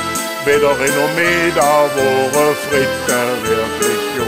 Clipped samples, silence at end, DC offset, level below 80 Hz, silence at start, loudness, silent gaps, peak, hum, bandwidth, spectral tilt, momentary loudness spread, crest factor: under 0.1%; 0 s; under 0.1%; -44 dBFS; 0 s; -14 LUFS; none; -2 dBFS; none; 16 kHz; -3 dB/octave; 4 LU; 12 dB